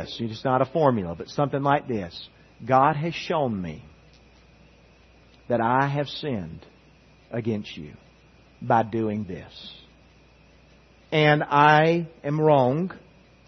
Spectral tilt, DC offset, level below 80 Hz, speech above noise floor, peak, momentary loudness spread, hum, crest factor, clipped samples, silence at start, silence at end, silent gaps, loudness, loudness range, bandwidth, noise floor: -7 dB/octave; under 0.1%; -58 dBFS; 31 dB; -4 dBFS; 21 LU; none; 22 dB; under 0.1%; 0 s; 0.5 s; none; -23 LUFS; 8 LU; 6.4 kHz; -55 dBFS